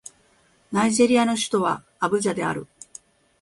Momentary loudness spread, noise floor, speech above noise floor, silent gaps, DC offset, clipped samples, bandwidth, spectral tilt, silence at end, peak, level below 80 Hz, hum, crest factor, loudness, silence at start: 20 LU; -60 dBFS; 39 dB; none; under 0.1%; under 0.1%; 11.5 kHz; -4 dB/octave; 0.75 s; -6 dBFS; -62 dBFS; none; 18 dB; -22 LUFS; 0.7 s